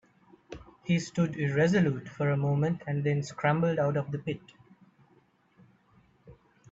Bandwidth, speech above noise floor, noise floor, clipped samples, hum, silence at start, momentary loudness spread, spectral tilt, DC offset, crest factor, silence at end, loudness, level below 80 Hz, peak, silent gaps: 7.8 kHz; 37 dB; -65 dBFS; under 0.1%; none; 0.5 s; 15 LU; -7 dB/octave; under 0.1%; 18 dB; 0.4 s; -29 LUFS; -64 dBFS; -12 dBFS; none